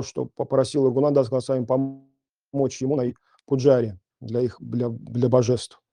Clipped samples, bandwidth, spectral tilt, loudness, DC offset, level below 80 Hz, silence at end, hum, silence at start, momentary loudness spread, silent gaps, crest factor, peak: under 0.1%; 10.5 kHz; -7 dB/octave; -23 LUFS; under 0.1%; -64 dBFS; 0.25 s; none; 0 s; 10 LU; none; 18 dB; -4 dBFS